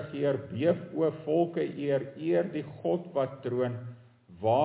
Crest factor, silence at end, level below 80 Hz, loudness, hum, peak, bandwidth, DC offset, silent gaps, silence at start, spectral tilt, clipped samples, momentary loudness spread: 18 dB; 0 s; -68 dBFS; -30 LUFS; none; -12 dBFS; 4 kHz; under 0.1%; none; 0 s; -11 dB/octave; under 0.1%; 5 LU